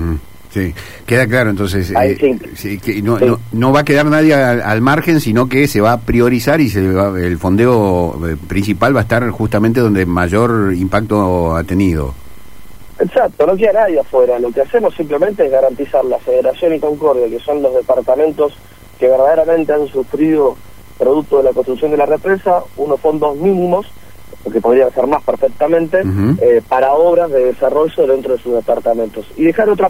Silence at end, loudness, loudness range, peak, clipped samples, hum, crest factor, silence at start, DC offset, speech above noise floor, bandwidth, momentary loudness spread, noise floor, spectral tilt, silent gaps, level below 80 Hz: 0 s; -13 LUFS; 3 LU; 0 dBFS; under 0.1%; none; 12 dB; 0 s; 2%; 26 dB; 16 kHz; 7 LU; -39 dBFS; -7 dB/octave; none; -36 dBFS